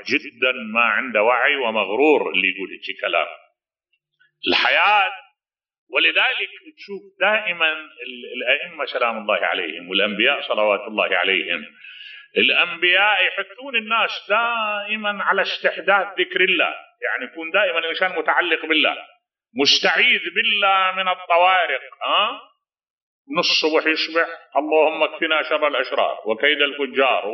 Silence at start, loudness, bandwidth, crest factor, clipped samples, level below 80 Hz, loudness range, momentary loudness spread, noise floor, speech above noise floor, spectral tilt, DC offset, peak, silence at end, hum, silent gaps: 0 s; -19 LUFS; 6.6 kHz; 18 dB; under 0.1%; -78 dBFS; 3 LU; 11 LU; -74 dBFS; 54 dB; 1 dB/octave; under 0.1%; -4 dBFS; 0 s; none; 5.78-5.87 s, 22.90-23.25 s